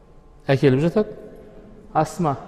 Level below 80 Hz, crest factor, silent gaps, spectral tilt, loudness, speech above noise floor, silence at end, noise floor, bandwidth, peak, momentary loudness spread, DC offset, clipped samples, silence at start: -46 dBFS; 18 dB; none; -7.5 dB/octave; -21 LUFS; 24 dB; 0 s; -43 dBFS; 13.5 kHz; -4 dBFS; 19 LU; under 0.1%; under 0.1%; 0.5 s